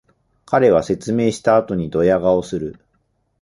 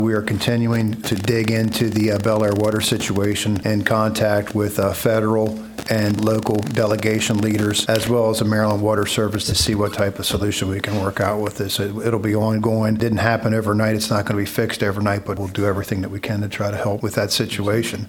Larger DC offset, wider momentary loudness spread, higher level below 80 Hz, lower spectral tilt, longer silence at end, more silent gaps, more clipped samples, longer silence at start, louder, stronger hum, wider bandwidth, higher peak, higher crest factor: neither; first, 10 LU vs 4 LU; about the same, -46 dBFS vs -44 dBFS; first, -6.5 dB/octave vs -5 dB/octave; first, 0.7 s vs 0 s; neither; neither; first, 0.5 s vs 0 s; first, -17 LUFS vs -20 LUFS; neither; second, 11.5 kHz vs 19 kHz; about the same, -2 dBFS vs 0 dBFS; about the same, 16 dB vs 20 dB